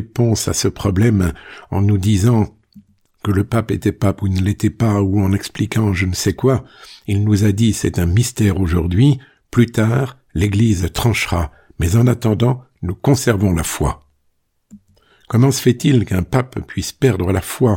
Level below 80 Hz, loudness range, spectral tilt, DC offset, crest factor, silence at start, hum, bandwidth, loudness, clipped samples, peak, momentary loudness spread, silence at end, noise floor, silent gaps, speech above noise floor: -34 dBFS; 2 LU; -6 dB/octave; under 0.1%; 14 dB; 0 s; none; 17 kHz; -17 LUFS; under 0.1%; -2 dBFS; 8 LU; 0 s; -64 dBFS; none; 48 dB